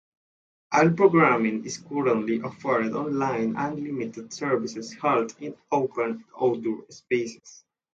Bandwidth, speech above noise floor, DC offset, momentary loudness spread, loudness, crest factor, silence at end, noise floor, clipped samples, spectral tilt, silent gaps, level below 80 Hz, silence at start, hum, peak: 8 kHz; over 65 dB; under 0.1%; 13 LU; -25 LUFS; 20 dB; 0.4 s; under -90 dBFS; under 0.1%; -6 dB/octave; none; -68 dBFS; 0.7 s; none; -6 dBFS